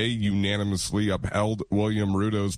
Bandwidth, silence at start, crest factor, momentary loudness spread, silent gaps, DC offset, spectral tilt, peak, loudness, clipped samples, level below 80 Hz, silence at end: 14 kHz; 0 s; 14 dB; 2 LU; none; under 0.1%; -5.5 dB/octave; -12 dBFS; -26 LUFS; under 0.1%; -46 dBFS; 0 s